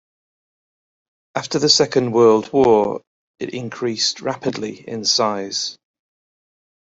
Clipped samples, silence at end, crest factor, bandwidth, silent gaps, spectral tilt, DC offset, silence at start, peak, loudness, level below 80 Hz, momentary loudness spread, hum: under 0.1%; 1.1 s; 20 dB; 8 kHz; 3.07-3.34 s; -3.5 dB/octave; under 0.1%; 1.35 s; 0 dBFS; -18 LUFS; -58 dBFS; 14 LU; none